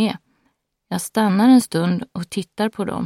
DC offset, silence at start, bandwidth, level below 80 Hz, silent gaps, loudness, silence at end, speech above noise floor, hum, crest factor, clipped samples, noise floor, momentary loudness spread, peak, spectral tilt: under 0.1%; 0 s; 16 kHz; -58 dBFS; none; -19 LUFS; 0 s; 50 dB; none; 16 dB; under 0.1%; -68 dBFS; 14 LU; -4 dBFS; -5.5 dB/octave